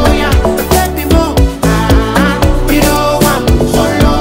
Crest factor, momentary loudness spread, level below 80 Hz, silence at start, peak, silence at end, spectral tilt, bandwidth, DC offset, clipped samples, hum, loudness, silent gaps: 10 dB; 2 LU; -14 dBFS; 0 s; 0 dBFS; 0 s; -5.5 dB/octave; 16.5 kHz; under 0.1%; under 0.1%; none; -10 LUFS; none